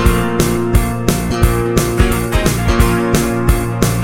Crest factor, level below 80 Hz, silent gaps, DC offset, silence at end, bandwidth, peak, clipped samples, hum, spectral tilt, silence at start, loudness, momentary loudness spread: 14 dB; -18 dBFS; none; under 0.1%; 0 s; 16.5 kHz; 0 dBFS; under 0.1%; none; -5.5 dB/octave; 0 s; -15 LUFS; 2 LU